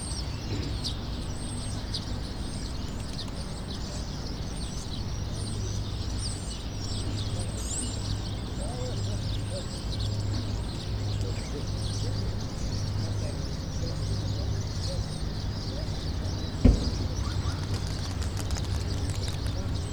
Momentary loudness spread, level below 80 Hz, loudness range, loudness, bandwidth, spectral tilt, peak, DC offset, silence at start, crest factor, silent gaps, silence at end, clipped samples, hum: 4 LU; -36 dBFS; 5 LU; -32 LUFS; over 20 kHz; -5 dB/octave; -6 dBFS; under 0.1%; 0 s; 26 dB; none; 0 s; under 0.1%; none